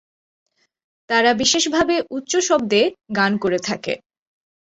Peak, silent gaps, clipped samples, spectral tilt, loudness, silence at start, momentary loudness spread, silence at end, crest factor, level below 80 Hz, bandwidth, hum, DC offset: -2 dBFS; none; under 0.1%; -2.5 dB/octave; -19 LUFS; 1.1 s; 8 LU; 0.7 s; 18 dB; -56 dBFS; 8.2 kHz; none; under 0.1%